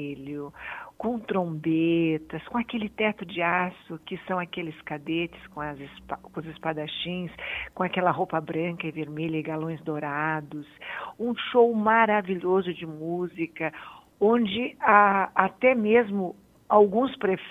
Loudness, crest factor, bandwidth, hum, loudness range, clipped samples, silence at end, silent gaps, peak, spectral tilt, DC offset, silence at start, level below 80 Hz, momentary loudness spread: -26 LUFS; 24 dB; 5 kHz; none; 9 LU; under 0.1%; 0 s; none; -2 dBFS; -8 dB/octave; under 0.1%; 0 s; -60 dBFS; 16 LU